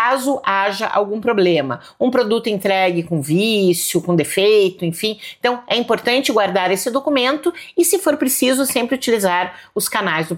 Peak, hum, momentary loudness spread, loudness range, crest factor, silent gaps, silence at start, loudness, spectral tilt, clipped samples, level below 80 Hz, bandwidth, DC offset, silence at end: -2 dBFS; none; 6 LU; 1 LU; 14 dB; none; 0 s; -17 LUFS; -4 dB/octave; under 0.1%; -62 dBFS; 17 kHz; under 0.1%; 0 s